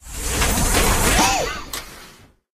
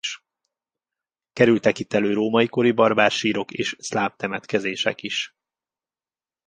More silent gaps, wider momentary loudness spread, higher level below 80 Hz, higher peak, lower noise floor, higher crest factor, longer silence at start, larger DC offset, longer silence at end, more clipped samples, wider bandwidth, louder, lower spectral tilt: neither; first, 15 LU vs 11 LU; first, -26 dBFS vs -64 dBFS; second, -6 dBFS vs -2 dBFS; second, -47 dBFS vs under -90 dBFS; second, 16 dB vs 22 dB; about the same, 0.05 s vs 0.05 s; neither; second, 0.45 s vs 1.2 s; neither; first, 15 kHz vs 9.8 kHz; first, -18 LUFS vs -21 LUFS; second, -2.5 dB/octave vs -4.5 dB/octave